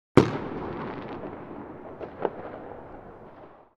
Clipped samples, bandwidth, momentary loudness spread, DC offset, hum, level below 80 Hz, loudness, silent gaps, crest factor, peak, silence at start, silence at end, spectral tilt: under 0.1%; 11.5 kHz; 20 LU; under 0.1%; none; -52 dBFS; -31 LUFS; none; 30 dB; 0 dBFS; 0.15 s; 0.15 s; -7.5 dB/octave